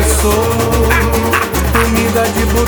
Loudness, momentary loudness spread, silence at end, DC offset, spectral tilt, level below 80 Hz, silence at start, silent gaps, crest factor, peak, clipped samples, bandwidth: -12 LUFS; 2 LU; 0 s; under 0.1%; -4.5 dB/octave; -18 dBFS; 0 s; none; 12 dB; 0 dBFS; under 0.1%; over 20 kHz